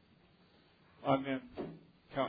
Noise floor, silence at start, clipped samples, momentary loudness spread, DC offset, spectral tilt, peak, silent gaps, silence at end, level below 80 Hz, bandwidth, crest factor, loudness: -66 dBFS; 1 s; under 0.1%; 13 LU; under 0.1%; -5 dB/octave; -16 dBFS; none; 0 s; -70 dBFS; 5 kHz; 24 dB; -38 LUFS